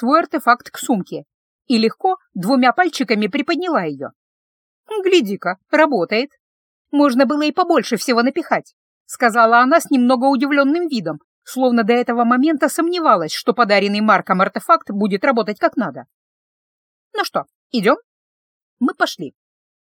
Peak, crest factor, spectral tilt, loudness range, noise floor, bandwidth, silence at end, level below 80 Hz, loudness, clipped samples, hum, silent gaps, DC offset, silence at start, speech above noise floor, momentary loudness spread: 0 dBFS; 18 dB; -4.5 dB/octave; 6 LU; under -90 dBFS; 18.5 kHz; 0.55 s; -78 dBFS; -17 LUFS; under 0.1%; none; 1.34-1.59 s, 4.15-4.84 s, 6.40-6.85 s, 8.73-9.06 s, 11.24-11.42 s, 16.14-17.11 s, 17.55-17.70 s, 18.04-18.77 s; under 0.1%; 0 s; over 74 dB; 10 LU